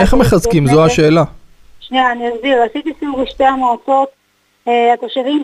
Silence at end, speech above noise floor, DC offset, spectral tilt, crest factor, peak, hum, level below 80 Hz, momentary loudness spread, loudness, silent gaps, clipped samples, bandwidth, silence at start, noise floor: 0 s; 26 dB; under 0.1%; -6 dB/octave; 12 dB; 0 dBFS; 50 Hz at -60 dBFS; -30 dBFS; 10 LU; -13 LUFS; none; under 0.1%; 15.5 kHz; 0 s; -38 dBFS